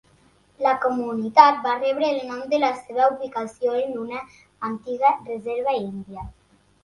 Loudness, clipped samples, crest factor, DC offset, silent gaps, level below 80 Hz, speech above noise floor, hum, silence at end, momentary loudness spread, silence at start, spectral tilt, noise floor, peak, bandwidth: -22 LUFS; under 0.1%; 22 dB; under 0.1%; none; -56 dBFS; 36 dB; 50 Hz at -65 dBFS; 0.5 s; 17 LU; 0.6 s; -5.5 dB/octave; -58 dBFS; 0 dBFS; 11.5 kHz